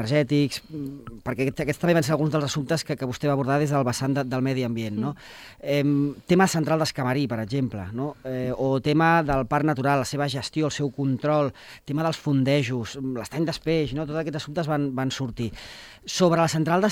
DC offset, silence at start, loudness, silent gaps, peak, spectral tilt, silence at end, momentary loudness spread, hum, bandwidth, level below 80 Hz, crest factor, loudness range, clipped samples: under 0.1%; 0 s; -25 LUFS; none; -6 dBFS; -6 dB/octave; 0 s; 11 LU; none; 16.5 kHz; -50 dBFS; 18 dB; 3 LU; under 0.1%